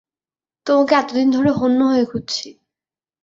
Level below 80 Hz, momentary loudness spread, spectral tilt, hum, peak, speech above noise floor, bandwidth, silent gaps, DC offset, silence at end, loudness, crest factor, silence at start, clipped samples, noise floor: -56 dBFS; 11 LU; -5 dB/octave; none; -2 dBFS; over 74 dB; 7.6 kHz; none; under 0.1%; 0.7 s; -17 LUFS; 18 dB; 0.65 s; under 0.1%; under -90 dBFS